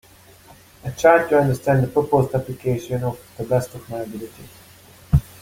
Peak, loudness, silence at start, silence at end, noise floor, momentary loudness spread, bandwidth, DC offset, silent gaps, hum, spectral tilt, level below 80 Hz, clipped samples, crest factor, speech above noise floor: -2 dBFS; -20 LUFS; 0.85 s; 0.2 s; -48 dBFS; 17 LU; 16.5 kHz; under 0.1%; none; none; -7 dB/octave; -38 dBFS; under 0.1%; 20 dB; 28 dB